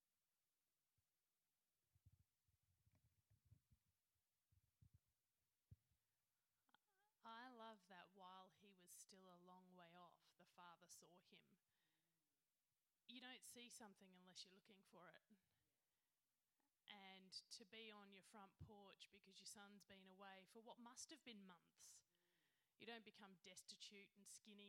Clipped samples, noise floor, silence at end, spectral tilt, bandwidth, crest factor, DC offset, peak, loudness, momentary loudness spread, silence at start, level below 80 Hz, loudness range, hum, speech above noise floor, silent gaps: under 0.1%; under -90 dBFS; 0 s; -2.5 dB/octave; 14 kHz; 24 dB; under 0.1%; -44 dBFS; -64 LUFS; 8 LU; 1.95 s; under -90 dBFS; 5 LU; none; over 24 dB; none